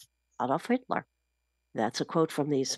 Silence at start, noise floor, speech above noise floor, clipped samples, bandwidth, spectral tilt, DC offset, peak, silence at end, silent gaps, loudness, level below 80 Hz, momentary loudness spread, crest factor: 0 s; -80 dBFS; 50 dB; under 0.1%; 12.5 kHz; -5 dB/octave; under 0.1%; -12 dBFS; 0 s; none; -31 LUFS; -78 dBFS; 7 LU; 20 dB